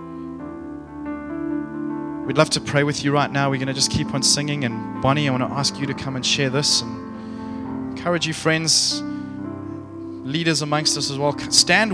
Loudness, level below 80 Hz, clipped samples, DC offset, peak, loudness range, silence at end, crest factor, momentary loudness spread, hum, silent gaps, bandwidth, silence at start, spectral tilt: -20 LUFS; -50 dBFS; under 0.1%; under 0.1%; 0 dBFS; 3 LU; 0 s; 22 dB; 16 LU; none; none; 11 kHz; 0 s; -3.5 dB/octave